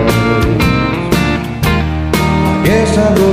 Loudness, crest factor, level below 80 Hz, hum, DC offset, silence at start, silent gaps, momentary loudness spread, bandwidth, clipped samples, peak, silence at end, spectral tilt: -12 LUFS; 12 dB; -22 dBFS; none; under 0.1%; 0 s; none; 4 LU; 16 kHz; under 0.1%; 0 dBFS; 0 s; -6 dB/octave